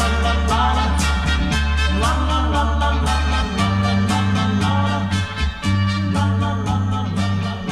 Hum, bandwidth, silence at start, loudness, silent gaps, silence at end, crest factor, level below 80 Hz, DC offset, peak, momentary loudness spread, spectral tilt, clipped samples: none; 12.5 kHz; 0 s; -19 LUFS; none; 0 s; 12 dB; -24 dBFS; under 0.1%; -6 dBFS; 3 LU; -5.5 dB/octave; under 0.1%